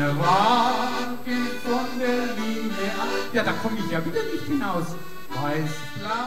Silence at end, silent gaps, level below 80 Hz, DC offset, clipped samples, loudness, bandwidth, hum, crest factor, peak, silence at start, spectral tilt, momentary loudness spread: 0 s; none; -56 dBFS; 3%; under 0.1%; -25 LUFS; 16 kHz; none; 18 dB; -8 dBFS; 0 s; -5 dB/octave; 10 LU